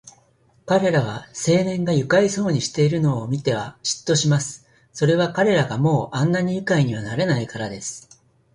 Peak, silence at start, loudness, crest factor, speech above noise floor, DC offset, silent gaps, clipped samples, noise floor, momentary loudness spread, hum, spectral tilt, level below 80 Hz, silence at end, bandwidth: -4 dBFS; 0.05 s; -21 LUFS; 16 dB; 38 dB; under 0.1%; none; under 0.1%; -58 dBFS; 10 LU; none; -5.5 dB/octave; -54 dBFS; 0.55 s; 11.5 kHz